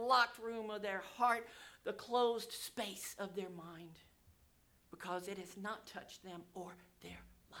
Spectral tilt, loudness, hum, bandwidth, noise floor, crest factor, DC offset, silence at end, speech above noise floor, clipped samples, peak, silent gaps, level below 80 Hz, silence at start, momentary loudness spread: -3 dB/octave; -41 LUFS; none; over 20 kHz; -71 dBFS; 22 dB; under 0.1%; 0 s; 30 dB; under 0.1%; -20 dBFS; none; -74 dBFS; 0 s; 19 LU